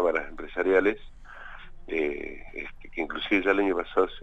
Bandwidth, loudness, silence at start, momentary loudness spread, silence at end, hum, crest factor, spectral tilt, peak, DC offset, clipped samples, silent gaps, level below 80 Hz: 8 kHz; -27 LUFS; 0 s; 21 LU; 0 s; none; 20 dB; -6 dB/octave; -8 dBFS; under 0.1%; under 0.1%; none; -46 dBFS